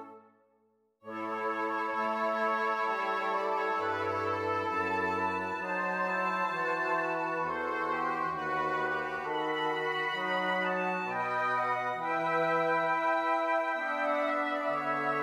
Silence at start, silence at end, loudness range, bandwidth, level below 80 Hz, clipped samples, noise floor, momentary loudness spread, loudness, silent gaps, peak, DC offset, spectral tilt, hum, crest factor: 0 s; 0 s; 2 LU; 16 kHz; -74 dBFS; under 0.1%; -71 dBFS; 4 LU; -31 LUFS; none; -18 dBFS; under 0.1%; -5 dB/octave; none; 14 dB